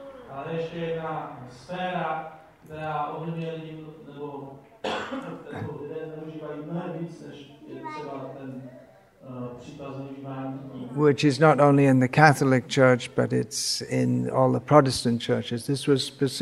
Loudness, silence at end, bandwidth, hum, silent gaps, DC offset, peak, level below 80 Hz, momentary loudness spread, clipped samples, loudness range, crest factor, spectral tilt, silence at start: -24 LUFS; 0 s; 13.5 kHz; none; none; under 0.1%; 0 dBFS; -62 dBFS; 21 LU; under 0.1%; 17 LU; 26 dB; -5.5 dB/octave; 0 s